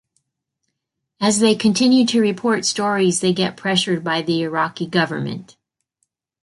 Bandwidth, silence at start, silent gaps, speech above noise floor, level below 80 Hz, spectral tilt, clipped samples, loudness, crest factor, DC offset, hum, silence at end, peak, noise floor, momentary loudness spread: 11.5 kHz; 1.2 s; none; 60 dB; -62 dBFS; -4 dB/octave; under 0.1%; -18 LUFS; 16 dB; under 0.1%; none; 1 s; -2 dBFS; -78 dBFS; 7 LU